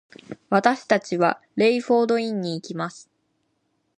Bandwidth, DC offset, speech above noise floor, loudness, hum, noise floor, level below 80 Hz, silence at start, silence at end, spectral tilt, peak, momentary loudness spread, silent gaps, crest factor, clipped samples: 10.5 kHz; under 0.1%; 50 dB; -22 LUFS; none; -71 dBFS; -72 dBFS; 0.3 s; 1 s; -5.5 dB/octave; -2 dBFS; 11 LU; none; 22 dB; under 0.1%